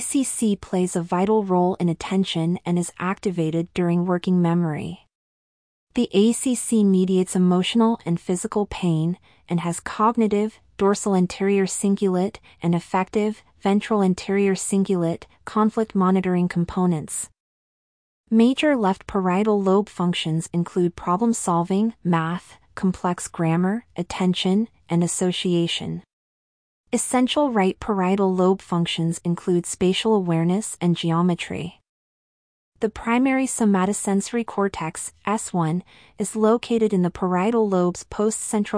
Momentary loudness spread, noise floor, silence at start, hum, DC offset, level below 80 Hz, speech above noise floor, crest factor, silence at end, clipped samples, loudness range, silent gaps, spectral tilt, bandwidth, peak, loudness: 8 LU; under -90 dBFS; 0 s; none; under 0.1%; -54 dBFS; over 69 dB; 16 dB; 0 s; under 0.1%; 2 LU; 5.15-5.87 s, 17.40-18.24 s, 26.13-26.84 s, 31.89-32.72 s; -5.5 dB/octave; 10.5 kHz; -6 dBFS; -22 LUFS